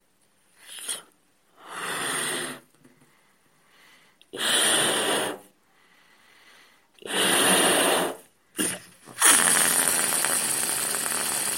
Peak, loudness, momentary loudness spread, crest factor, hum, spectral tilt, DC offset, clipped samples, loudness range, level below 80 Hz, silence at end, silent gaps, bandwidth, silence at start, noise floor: -2 dBFS; -22 LUFS; 21 LU; 26 dB; none; -0.5 dB/octave; under 0.1%; under 0.1%; 12 LU; -72 dBFS; 0 s; none; 16.5 kHz; 0.65 s; -66 dBFS